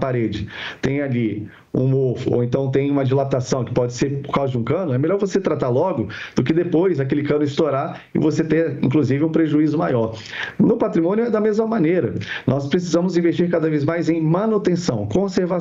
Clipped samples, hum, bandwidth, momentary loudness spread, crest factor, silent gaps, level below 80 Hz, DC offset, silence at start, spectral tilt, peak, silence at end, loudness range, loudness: under 0.1%; none; 7.8 kHz; 6 LU; 16 dB; none; -50 dBFS; under 0.1%; 0 s; -7.5 dB/octave; -2 dBFS; 0 s; 2 LU; -20 LUFS